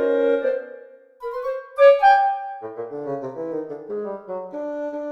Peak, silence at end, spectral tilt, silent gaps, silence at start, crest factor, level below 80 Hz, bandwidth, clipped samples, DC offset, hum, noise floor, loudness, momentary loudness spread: -4 dBFS; 0 s; -6 dB/octave; none; 0 s; 18 dB; -64 dBFS; 6 kHz; under 0.1%; under 0.1%; none; -44 dBFS; -21 LUFS; 17 LU